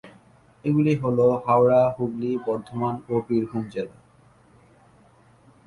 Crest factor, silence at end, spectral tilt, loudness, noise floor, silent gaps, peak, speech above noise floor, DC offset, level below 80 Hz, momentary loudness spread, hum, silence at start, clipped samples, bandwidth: 18 dB; 1.8 s; -9.5 dB/octave; -23 LUFS; -56 dBFS; none; -8 dBFS; 34 dB; under 0.1%; -60 dBFS; 12 LU; none; 0.05 s; under 0.1%; 11 kHz